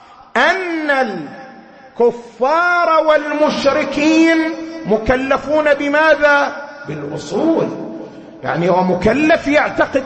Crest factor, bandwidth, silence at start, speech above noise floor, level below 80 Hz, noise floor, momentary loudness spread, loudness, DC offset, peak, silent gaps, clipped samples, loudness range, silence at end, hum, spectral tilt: 14 dB; 8.6 kHz; 0.35 s; 25 dB; -42 dBFS; -39 dBFS; 15 LU; -15 LUFS; under 0.1%; 0 dBFS; none; under 0.1%; 3 LU; 0 s; none; -5.5 dB/octave